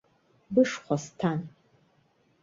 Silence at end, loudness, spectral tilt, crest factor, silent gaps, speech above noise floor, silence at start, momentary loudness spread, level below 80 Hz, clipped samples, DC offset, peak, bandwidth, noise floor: 0.95 s; -28 LUFS; -6 dB/octave; 20 dB; none; 40 dB; 0.5 s; 10 LU; -68 dBFS; under 0.1%; under 0.1%; -10 dBFS; 7.8 kHz; -67 dBFS